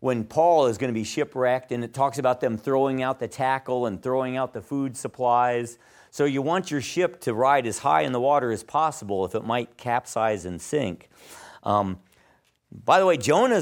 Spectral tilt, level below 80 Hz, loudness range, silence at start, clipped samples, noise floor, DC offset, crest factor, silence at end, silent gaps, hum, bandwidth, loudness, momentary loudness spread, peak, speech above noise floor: -5 dB/octave; -64 dBFS; 4 LU; 0 s; under 0.1%; -63 dBFS; under 0.1%; 18 dB; 0 s; none; none; 17.5 kHz; -24 LUFS; 10 LU; -6 dBFS; 39 dB